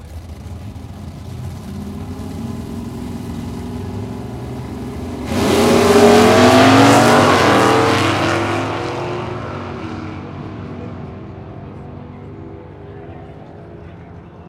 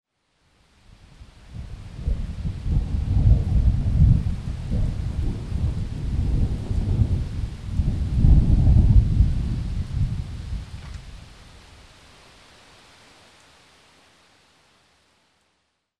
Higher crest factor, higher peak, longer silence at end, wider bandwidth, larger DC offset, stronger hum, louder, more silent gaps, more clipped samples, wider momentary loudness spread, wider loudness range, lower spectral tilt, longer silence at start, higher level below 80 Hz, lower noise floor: about the same, 16 dB vs 20 dB; about the same, 0 dBFS vs -2 dBFS; second, 0 s vs 4.55 s; first, 16.5 kHz vs 9.4 kHz; neither; neither; first, -14 LUFS vs -23 LUFS; neither; neither; first, 25 LU vs 20 LU; first, 21 LU vs 12 LU; second, -5 dB/octave vs -8.5 dB/octave; second, 0 s vs 1.2 s; second, -40 dBFS vs -26 dBFS; second, -36 dBFS vs -72 dBFS